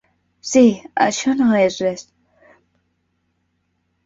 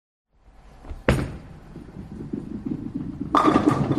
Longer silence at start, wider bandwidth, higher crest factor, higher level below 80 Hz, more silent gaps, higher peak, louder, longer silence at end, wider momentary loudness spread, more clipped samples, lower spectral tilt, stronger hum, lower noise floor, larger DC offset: second, 0.45 s vs 0.75 s; second, 8 kHz vs 13 kHz; about the same, 18 dB vs 22 dB; second, -60 dBFS vs -40 dBFS; neither; about the same, -2 dBFS vs -4 dBFS; first, -17 LUFS vs -24 LUFS; first, 2.05 s vs 0 s; second, 12 LU vs 23 LU; neither; second, -4.5 dB/octave vs -7 dB/octave; neither; first, -69 dBFS vs -51 dBFS; neither